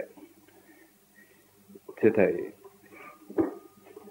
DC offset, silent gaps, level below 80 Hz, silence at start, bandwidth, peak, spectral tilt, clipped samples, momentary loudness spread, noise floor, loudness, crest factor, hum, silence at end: under 0.1%; none; -72 dBFS; 0 s; 16 kHz; -8 dBFS; -8 dB/octave; under 0.1%; 27 LU; -59 dBFS; -28 LUFS; 24 dB; 50 Hz at -65 dBFS; 0 s